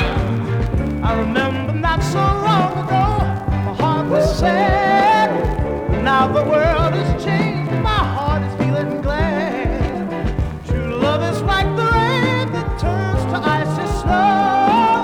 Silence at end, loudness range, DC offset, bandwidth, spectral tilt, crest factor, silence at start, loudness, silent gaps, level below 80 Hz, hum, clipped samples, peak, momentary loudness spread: 0 s; 4 LU; under 0.1%; 16 kHz; -6.5 dB/octave; 14 dB; 0 s; -17 LUFS; none; -28 dBFS; none; under 0.1%; -2 dBFS; 6 LU